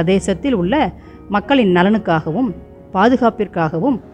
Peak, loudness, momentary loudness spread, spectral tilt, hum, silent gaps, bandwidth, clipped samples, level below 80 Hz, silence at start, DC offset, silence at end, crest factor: -2 dBFS; -16 LUFS; 9 LU; -6.5 dB/octave; none; none; 11 kHz; under 0.1%; -40 dBFS; 0 s; under 0.1%; 0.05 s; 14 dB